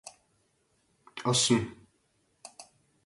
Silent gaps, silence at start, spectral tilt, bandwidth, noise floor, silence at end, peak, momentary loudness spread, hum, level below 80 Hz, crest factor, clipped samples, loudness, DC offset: none; 0.05 s; -3.5 dB/octave; 11.5 kHz; -72 dBFS; 0.45 s; -12 dBFS; 25 LU; none; -64 dBFS; 22 dB; under 0.1%; -27 LUFS; under 0.1%